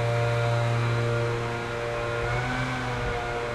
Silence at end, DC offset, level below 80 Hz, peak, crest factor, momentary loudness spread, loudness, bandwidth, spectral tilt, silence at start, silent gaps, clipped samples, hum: 0 s; under 0.1%; -42 dBFS; -14 dBFS; 12 dB; 4 LU; -27 LUFS; 11.5 kHz; -6 dB/octave; 0 s; none; under 0.1%; none